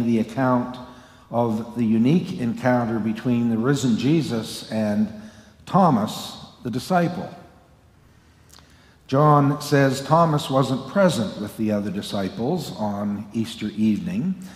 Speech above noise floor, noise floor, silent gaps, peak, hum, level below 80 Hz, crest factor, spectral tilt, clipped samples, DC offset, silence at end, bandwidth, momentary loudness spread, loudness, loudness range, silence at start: 32 dB; -53 dBFS; none; -4 dBFS; none; -58 dBFS; 18 dB; -6.5 dB/octave; under 0.1%; under 0.1%; 0 s; 15.5 kHz; 10 LU; -22 LUFS; 5 LU; 0 s